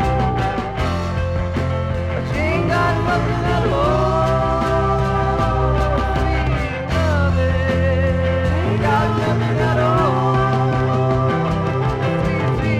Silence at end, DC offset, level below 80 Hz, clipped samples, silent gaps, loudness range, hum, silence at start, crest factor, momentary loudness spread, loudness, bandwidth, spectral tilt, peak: 0 s; under 0.1%; -28 dBFS; under 0.1%; none; 2 LU; none; 0 s; 12 dB; 4 LU; -18 LUFS; 10.5 kHz; -7.5 dB/octave; -6 dBFS